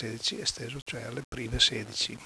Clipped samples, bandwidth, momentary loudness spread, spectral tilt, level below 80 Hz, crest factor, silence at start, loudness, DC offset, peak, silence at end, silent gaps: under 0.1%; 11 kHz; 13 LU; -2.5 dB/octave; -48 dBFS; 24 dB; 0 s; -30 LUFS; under 0.1%; -8 dBFS; 0 s; 0.82-0.86 s, 1.24-1.32 s